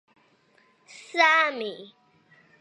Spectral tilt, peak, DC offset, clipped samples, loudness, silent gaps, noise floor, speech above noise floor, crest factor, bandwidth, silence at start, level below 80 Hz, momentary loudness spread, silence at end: -1.5 dB/octave; -6 dBFS; under 0.1%; under 0.1%; -22 LUFS; none; -63 dBFS; 39 dB; 22 dB; 11.5 kHz; 0.95 s; -90 dBFS; 18 LU; 0.75 s